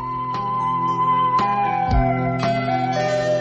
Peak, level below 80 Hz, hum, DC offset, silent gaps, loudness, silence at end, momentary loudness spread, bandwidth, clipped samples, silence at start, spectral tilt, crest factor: -6 dBFS; -32 dBFS; none; under 0.1%; none; -20 LUFS; 0 s; 4 LU; 8.4 kHz; under 0.1%; 0 s; -6.5 dB/octave; 14 dB